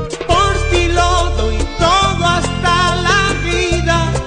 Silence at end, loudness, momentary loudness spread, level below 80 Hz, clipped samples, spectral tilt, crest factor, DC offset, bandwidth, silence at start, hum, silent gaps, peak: 0 s; -14 LUFS; 4 LU; -20 dBFS; under 0.1%; -4 dB/octave; 12 dB; under 0.1%; 10 kHz; 0 s; none; none; -2 dBFS